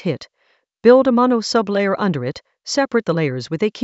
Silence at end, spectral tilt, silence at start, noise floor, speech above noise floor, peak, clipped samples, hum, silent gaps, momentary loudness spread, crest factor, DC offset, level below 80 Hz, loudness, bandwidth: 0 s; -5.5 dB/octave; 0.05 s; -63 dBFS; 46 dB; 0 dBFS; under 0.1%; none; none; 13 LU; 18 dB; under 0.1%; -60 dBFS; -17 LUFS; 8.2 kHz